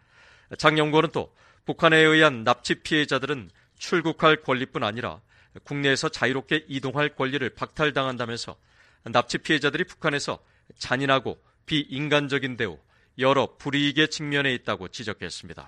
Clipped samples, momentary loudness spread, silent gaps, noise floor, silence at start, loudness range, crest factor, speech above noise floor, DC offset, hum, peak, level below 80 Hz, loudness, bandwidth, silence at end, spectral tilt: under 0.1%; 14 LU; none; -56 dBFS; 0.5 s; 5 LU; 24 dB; 31 dB; under 0.1%; none; -2 dBFS; -58 dBFS; -24 LUFS; 11 kHz; 0 s; -4.5 dB/octave